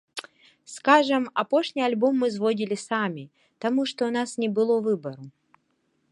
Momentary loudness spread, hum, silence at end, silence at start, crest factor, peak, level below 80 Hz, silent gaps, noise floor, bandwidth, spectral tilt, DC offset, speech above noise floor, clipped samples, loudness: 18 LU; none; 0.85 s; 0.15 s; 22 dB; -4 dBFS; -78 dBFS; none; -71 dBFS; 11.5 kHz; -5 dB/octave; under 0.1%; 47 dB; under 0.1%; -24 LUFS